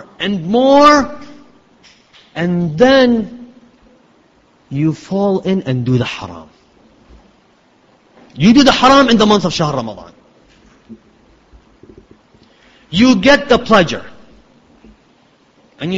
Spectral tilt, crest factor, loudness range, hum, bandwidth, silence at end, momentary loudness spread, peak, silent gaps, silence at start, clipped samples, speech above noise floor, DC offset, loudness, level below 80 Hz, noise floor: -5.5 dB/octave; 16 dB; 7 LU; none; 8 kHz; 0 s; 18 LU; 0 dBFS; none; 0.2 s; under 0.1%; 40 dB; under 0.1%; -12 LUFS; -44 dBFS; -52 dBFS